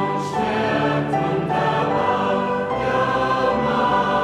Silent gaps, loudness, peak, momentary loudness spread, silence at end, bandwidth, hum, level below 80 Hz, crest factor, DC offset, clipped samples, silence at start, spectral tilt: none; -20 LUFS; -8 dBFS; 3 LU; 0 s; 12 kHz; none; -46 dBFS; 12 dB; under 0.1%; under 0.1%; 0 s; -6.5 dB/octave